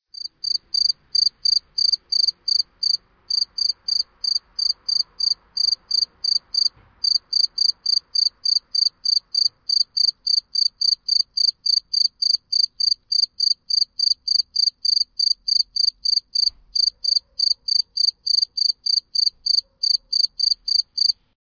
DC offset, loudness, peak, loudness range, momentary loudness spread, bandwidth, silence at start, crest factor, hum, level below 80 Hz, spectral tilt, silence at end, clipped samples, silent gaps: under 0.1%; -18 LUFS; -6 dBFS; 2 LU; 4 LU; 5.2 kHz; 0.2 s; 14 dB; none; -62 dBFS; 3.5 dB/octave; 0.3 s; under 0.1%; none